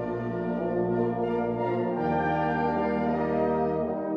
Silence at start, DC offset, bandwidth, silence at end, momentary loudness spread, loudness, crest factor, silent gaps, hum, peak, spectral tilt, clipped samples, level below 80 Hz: 0 s; under 0.1%; 5.8 kHz; 0 s; 3 LU; -27 LUFS; 14 dB; none; none; -14 dBFS; -9.5 dB/octave; under 0.1%; -52 dBFS